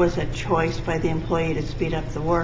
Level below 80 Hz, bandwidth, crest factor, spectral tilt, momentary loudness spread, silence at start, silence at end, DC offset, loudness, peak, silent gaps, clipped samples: -34 dBFS; 7.8 kHz; 14 dB; -6.5 dB/octave; 4 LU; 0 s; 0 s; under 0.1%; -25 LUFS; -8 dBFS; none; under 0.1%